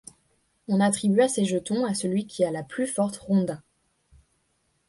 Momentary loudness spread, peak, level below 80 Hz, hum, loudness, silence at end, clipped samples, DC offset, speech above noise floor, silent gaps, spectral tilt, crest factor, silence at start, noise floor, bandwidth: 8 LU; -8 dBFS; -64 dBFS; none; -25 LUFS; 1.3 s; under 0.1%; under 0.1%; 47 dB; none; -5.5 dB/octave; 18 dB; 0.7 s; -71 dBFS; 11.5 kHz